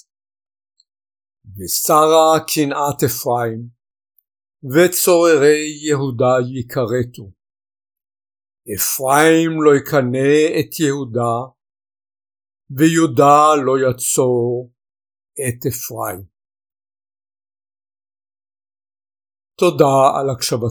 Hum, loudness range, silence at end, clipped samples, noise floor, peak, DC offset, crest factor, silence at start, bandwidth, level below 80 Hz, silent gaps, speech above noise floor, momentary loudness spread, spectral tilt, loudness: none; 11 LU; 0 s; under 0.1%; under -90 dBFS; 0 dBFS; under 0.1%; 18 dB; 1.45 s; over 20 kHz; -58 dBFS; none; over 75 dB; 13 LU; -4.5 dB/octave; -15 LUFS